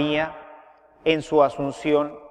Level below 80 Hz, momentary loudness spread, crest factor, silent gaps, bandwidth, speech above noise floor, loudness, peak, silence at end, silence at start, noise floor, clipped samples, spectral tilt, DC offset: -56 dBFS; 9 LU; 18 dB; none; 9.8 kHz; 29 dB; -23 LUFS; -4 dBFS; 0.05 s; 0 s; -51 dBFS; under 0.1%; -6 dB/octave; under 0.1%